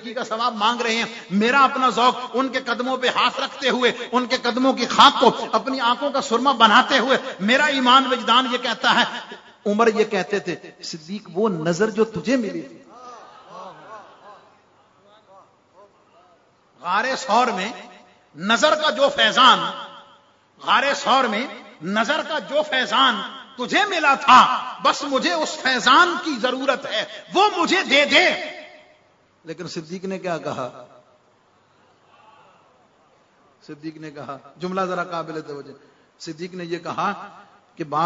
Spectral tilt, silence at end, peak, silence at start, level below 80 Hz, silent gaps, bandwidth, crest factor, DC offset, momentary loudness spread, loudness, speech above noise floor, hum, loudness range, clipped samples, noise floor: -3 dB/octave; 0 s; 0 dBFS; 0 s; -68 dBFS; none; 7.8 kHz; 22 dB; under 0.1%; 20 LU; -19 LUFS; 39 dB; none; 14 LU; under 0.1%; -59 dBFS